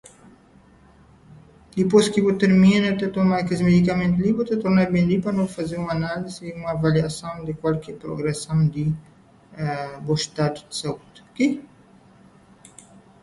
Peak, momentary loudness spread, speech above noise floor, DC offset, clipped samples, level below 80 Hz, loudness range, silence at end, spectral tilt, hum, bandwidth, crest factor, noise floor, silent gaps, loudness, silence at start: -4 dBFS; 14 LU; 31 dB; under 0.1%; under 0.1%; -50 dBFS; 8 LU; 1.6 s; -6.5 dB/octave; none; 11.5 kHz; 18 dB; -52 dBFS; none; -22 LUFS; 1.3 s